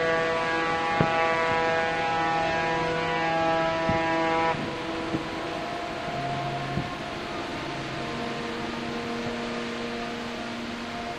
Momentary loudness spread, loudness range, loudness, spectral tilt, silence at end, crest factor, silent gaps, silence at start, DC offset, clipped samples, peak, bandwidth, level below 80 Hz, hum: 9 LU; 7 LU; -27 LUFS; -5 dB/octave; 0 s; 22 dB; none; 0 s; under 0.1%; under 0.1%; -6 dBFS; 13 kHz; -50 dBFS; none